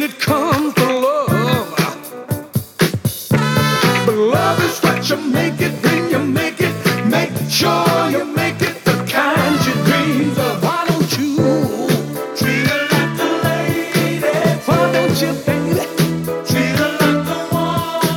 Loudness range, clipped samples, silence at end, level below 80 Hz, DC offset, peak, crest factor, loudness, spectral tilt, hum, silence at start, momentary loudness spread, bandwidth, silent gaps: 1 LU; under 0.1%; 0 s; -50 dBFS; under 0.1%; -2 dBFS; 14 dB; -16 LUFS; -5 dB/octave; none; 0 s; 4 LU; 18.5 kHz; none